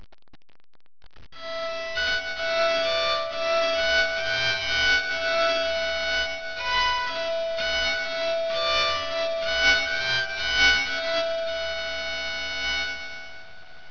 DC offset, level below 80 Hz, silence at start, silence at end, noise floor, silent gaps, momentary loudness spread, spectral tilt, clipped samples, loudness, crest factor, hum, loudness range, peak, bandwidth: 1%; -48 dBFS; 0 s; 0 s; -47 dBFS; none; 9 LU; -1 dB/octave; under 0.1%; -24 LUFS; 18 dB; none; 3 LU; -8 dBFS; 5.4 kHz